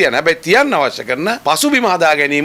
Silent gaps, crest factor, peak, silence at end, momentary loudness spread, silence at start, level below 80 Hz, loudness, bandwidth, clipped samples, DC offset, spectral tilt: none; 12 dB; 0 dBFS; 0 s; 6 LU; 0 s; -54 dBFS; -13 LUFS; 17 kHz; under 0.1%; under 0.1%; -3 dB/octave